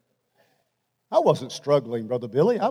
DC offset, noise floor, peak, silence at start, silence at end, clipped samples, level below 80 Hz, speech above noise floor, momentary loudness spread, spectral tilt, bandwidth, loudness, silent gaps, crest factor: under 0.1%; -75 dBFS; -6 dBFS; 1.1 s; 0 s; under 0.1%; -82 dBFS; 52 dB; 7 LU; -6.5 dB/octave; 13 kHz; -23 LUFS; none; 18 dB